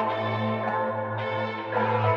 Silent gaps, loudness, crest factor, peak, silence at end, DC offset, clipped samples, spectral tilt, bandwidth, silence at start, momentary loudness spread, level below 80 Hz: none; -27 LUFS; 16 dB; -10 dBFS; 0 s; under 0.1%; under 0.1%; -8 dB/octave; 6 kHz; 0 s; 4 LU; -70 dBFS